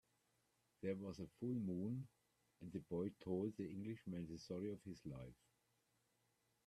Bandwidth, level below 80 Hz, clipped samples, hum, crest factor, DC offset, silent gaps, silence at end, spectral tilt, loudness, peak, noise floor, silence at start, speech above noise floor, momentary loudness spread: 13.5 kHz; -76 dBFS; under 0.1%; none; 18 dB; under 0.1%; none; 1.3 s; -8 dB/octave; -49 LUFS; -32 dBFS; -84 dBFS; 0.8 s; 36 dB; 9 LU